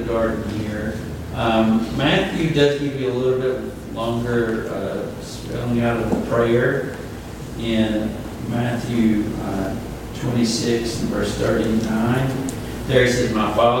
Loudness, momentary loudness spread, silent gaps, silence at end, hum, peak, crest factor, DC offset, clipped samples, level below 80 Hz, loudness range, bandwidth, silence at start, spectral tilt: -21 LUFS; 11 LU; none; 0 s; none; -2 dBFS; 18 dB; under 0.1%; under 0.1%; -38 dBFS; 3 LU; 17 kHz; 0 s; -6 dB/octave